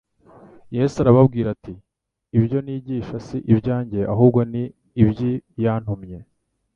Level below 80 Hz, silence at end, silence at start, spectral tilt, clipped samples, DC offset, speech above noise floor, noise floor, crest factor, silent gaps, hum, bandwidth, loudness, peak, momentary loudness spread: -46 dBFS; 0.55 s; 0.7 s; -9.5 dB/octave; under 0.1%; under 0.1%; 29 dB; -49 dBFS; 20 dB; none; none; 7.2 kHz; -20 LUFS; -2 dBFS; 14 LU